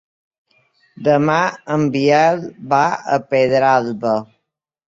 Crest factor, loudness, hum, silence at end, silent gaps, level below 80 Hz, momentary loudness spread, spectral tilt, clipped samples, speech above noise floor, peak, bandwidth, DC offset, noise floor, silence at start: 16 dB; -16 LUFS; none; 0.65 s; none; -60 dBFS; 7 LU; -6 dB/octave; under 0.1%; 61 dB; -2 dBFS; 7.8 kHz; under 0.1%; -77 dBFS; 1 s